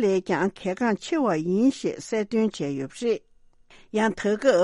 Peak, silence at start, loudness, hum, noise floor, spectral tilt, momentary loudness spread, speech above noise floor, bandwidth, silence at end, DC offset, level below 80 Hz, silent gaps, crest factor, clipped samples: -6 dBFS; 0 s; -25 LUFS; none; -54 dBFS; -5.5 dB/octave; 8 LU; 30 dB; 11.5 kHz; 0 s; under 0.1%; -60 dBFS; none; 18 dB; under 0.1%